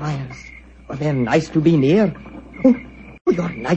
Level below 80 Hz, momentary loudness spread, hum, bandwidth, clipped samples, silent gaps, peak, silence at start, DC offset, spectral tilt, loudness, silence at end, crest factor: -46 dBFS; 22 LU; none; 8.4 kHz; under 0.1%; 3.21-3.25 s; -2 dBFS; 0 s; under 0.1%; -7.5 dB/octave; -18 LUFS; 0 s; 16 dB